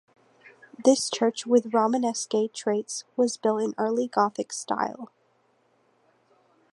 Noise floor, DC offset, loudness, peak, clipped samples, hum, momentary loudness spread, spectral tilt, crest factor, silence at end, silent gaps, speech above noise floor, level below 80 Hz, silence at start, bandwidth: -67 dBFS; under 0.1%; -26 LUFS; -8 dBFS; under 0.1%; none; 9 LU; -3.5 dB/octave; 20 dB; 1.65 s; none; 41 dB; -80 dBFS; 0.8 s; 11.5 kHz